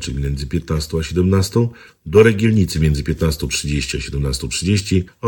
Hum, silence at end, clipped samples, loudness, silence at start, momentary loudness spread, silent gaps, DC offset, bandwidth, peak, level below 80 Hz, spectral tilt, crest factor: none; 0 s; under 0.1%; -18 LUFS; 0 s; 10 LU; none; under 0.1%; 18 kHz; 0 dBFS; -28 dBFS; -5.5 dB/octave; 16 dB